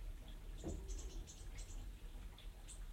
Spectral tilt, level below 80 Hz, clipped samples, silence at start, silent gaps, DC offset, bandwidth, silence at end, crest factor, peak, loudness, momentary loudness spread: -4.5 dB/octave; -50 dBFS; under 0.1%; 0 s; none; under 0.1%; 16 kHz; 0 s; 14 dB; -36 dBFS; -54 LUFS; 6 LU